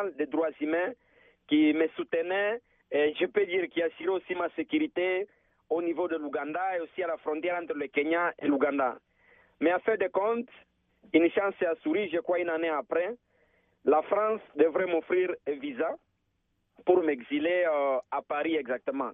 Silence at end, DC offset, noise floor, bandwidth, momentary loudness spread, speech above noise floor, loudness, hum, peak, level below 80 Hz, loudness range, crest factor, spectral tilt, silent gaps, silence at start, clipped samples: 0 s; under 0.1%; -76 dBFS; 3.9 kHz; 8 LU; 48 dB; -29 LUFS; none; -10 dBFS; -76 dBFS; 2 LU; 20 dB; -2.5 dB/octave; none; 0 s; under 0.1%